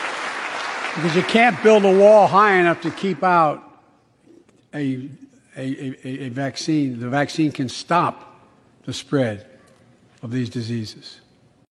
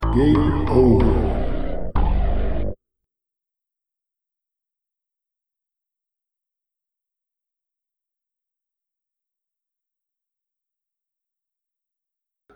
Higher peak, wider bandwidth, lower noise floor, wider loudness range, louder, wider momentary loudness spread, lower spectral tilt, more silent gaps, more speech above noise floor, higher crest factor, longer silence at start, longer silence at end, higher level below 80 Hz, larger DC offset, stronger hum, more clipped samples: about the same, 0 dBFS vs -2 dBFS; first, 11.5 kHz vs 8.8 kHz; second, -56 dBFS vs -87 dBFS; about the same, 13 LU vs 14 LU; about the same, -19 LUFS vs -20 LUFS; first, 19 LU vs 12 LU; second, -5.5 dB/octave vs -9.5 dB/octave; neither; second, 38 dB vs 71 dB; about the same, 20 dB vs 22 dB; about the same, 0 s vs 0 s; second, 0.55 s vs 9.8 s; second, -68 dBFS vs -28 dBFS; neither; neither; neither